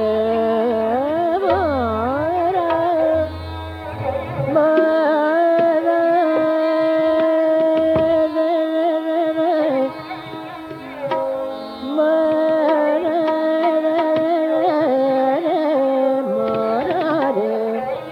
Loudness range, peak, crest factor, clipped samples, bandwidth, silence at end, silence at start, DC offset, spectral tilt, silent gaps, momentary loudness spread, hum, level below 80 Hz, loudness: 4 LU; -4 dBFS; 14 dB; under 0.1%; 8.8 kHz; 0 s; 0 s; under 0.1%; -7.5 dB/octave; none; 9 LU; none; -52 dBFS; -18 LUFS